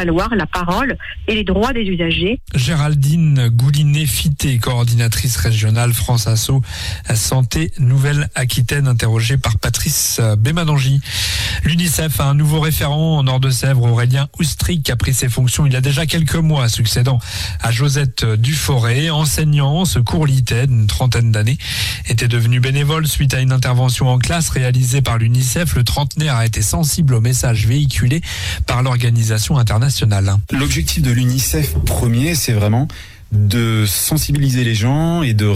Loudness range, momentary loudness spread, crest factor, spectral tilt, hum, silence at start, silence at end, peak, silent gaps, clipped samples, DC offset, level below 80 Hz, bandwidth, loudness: 1 LU; 3 LU; 8 dB; -5 dB/octave; none; 0 s; 0 s; -6 dBFS; none; under 0.1%; under 0.1%; -28 dBFS; 16 kHz; -15 LUFS